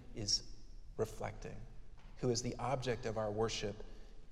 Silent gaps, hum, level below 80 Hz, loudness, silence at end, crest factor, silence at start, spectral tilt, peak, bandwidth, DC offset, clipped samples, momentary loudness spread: none; none; -52 dBFS; -39 LUFS; 0 s; 18 dB; 0 s; -4 dB/octave; -22 dBFS; 14.5 kHz; under 0.1%; under 0.1%; 22 LU